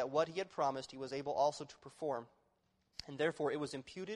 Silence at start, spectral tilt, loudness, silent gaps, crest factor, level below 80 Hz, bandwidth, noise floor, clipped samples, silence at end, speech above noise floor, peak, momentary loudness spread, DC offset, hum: 0 s; -4.5 dB/octave; -39 LUFS; none; 18 dB; -76 dBFS; 11.5 kHz; -79 dBFS; under 0.1%; 0 s; 40 dB; -20 dBFS; 14 LU; under 0.1%; none